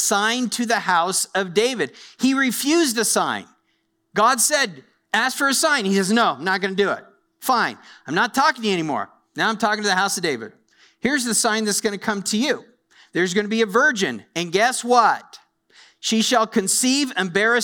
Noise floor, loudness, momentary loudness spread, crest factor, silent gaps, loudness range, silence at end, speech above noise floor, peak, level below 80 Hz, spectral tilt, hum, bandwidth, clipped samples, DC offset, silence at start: -69 dBFS; -20 LUFS; 10 LU; 18 dB; none; 2 LU; 0 s; 49 dB; -4 dBFS; -66 dBFS; -2.5 dB/octave; none; over 20 kHz; under 0.1%; under 0.1%; 0 s